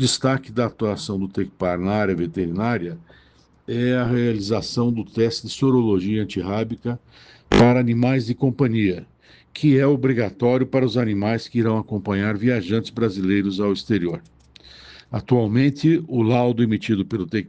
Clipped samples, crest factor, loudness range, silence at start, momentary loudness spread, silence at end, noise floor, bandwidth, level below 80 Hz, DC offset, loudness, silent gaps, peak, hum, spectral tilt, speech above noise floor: under 0.1%; 18 dB; 4 LU; 0 s; 8 LU; 0 s; -47 dBFS; 9.4 kHz; -46 dBFS; under 0.1%; -21 LUFS; none; -2 dBFS; none; -6.5 dB/octave; 27 dB